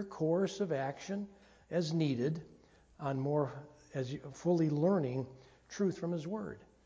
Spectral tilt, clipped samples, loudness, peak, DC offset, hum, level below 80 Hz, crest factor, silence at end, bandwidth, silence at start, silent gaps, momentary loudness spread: -7 dB/octave; under 0.1%; -36 LUFS; -18 dBFS; under 0.1%; none; -70 dBFS; 16 dB; 0.2 s; 8 kHz; 0 s; none; 13 LU